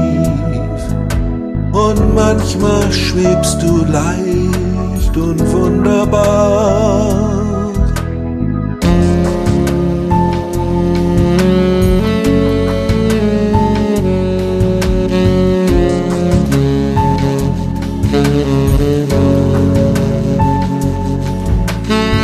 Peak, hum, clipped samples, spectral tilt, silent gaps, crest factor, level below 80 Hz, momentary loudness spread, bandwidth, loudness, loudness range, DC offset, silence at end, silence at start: 0 dBFS; none; under 0.1%; -7 dB/octave; none; 12 dB; -22 dBFS; 5 LU; 14 kHz; -13 LUFS; 1 LU; under 0.1%; 0 s; 0 s